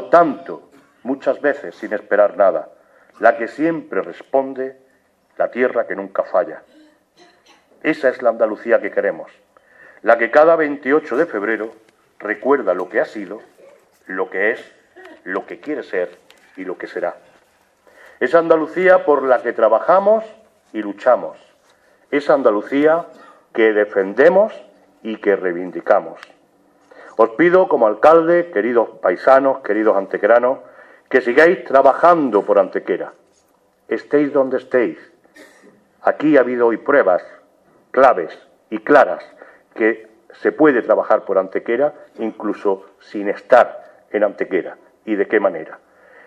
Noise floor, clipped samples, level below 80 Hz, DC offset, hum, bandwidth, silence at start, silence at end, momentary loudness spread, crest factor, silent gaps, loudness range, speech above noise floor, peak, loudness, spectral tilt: -58 dBFS; under 0.1%; -66 dBFS; under 0.1%; none; 8.6 kHz; 0 s; 0.5 s; 15 LU; 18 dB; none; 7 LU; 42 dB; 0 dBFS; -17 LUFS; -7 dB/octave